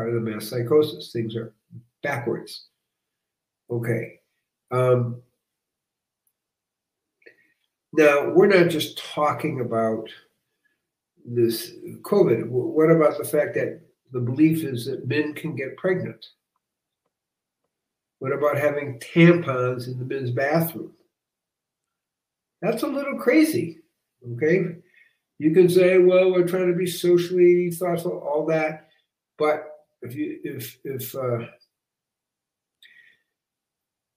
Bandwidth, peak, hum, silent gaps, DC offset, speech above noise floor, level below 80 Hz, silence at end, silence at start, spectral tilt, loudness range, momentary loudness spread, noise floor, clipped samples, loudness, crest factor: 16 kHz; -2 dBFS; none; none; under 0.1%; 64 dB; -72 dBFS; 2.65 s; 0 s; -6.5 dB/octave; 11 LU; 16 LU; -86 dBFS; under 0.1%; -22 LUFS; 22 dB